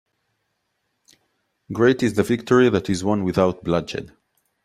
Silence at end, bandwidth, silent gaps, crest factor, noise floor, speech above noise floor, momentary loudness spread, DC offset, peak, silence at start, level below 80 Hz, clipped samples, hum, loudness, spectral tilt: 0.55 s; 14 kHz; none; 18 dB; -74 dBFS; 54 dB; 11 LU; under 0.1%; -4 dBFS; 1.7 s; -54 dBFS; under 0.1%; none; -20 LUFS; -6.5 dB/octave